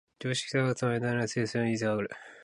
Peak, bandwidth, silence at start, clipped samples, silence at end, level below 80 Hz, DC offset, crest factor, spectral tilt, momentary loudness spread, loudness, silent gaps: -16 dBFS; 11.5 kHz; 0.2 s; under 0.1%; 0 s; -66 dBFS; under 0.1%; 14 dB; -5.5 dB/octave; 4 LU; -30 LUFS; none